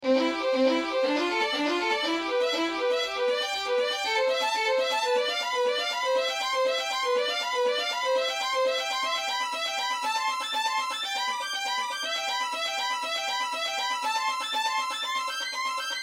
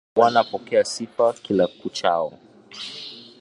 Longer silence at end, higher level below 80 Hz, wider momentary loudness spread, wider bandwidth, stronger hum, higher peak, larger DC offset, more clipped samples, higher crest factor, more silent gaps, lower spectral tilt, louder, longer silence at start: second, 0 s vs 0.2 s; second, -72 dBFS vs -64 dBFS; second, 3 LU vs 17 LU; first, 16.5 kHz vs 11.5 kHz; neither; second, -12 dBFS vs -2 dBFS; neither; neither; about the same, 16 dB vs 20 dB; neither; second, 0 dB/octave vs -4 dB/octave; second, -27 LUFS vs -22 LUFS; second, 0 s vs 0.15 s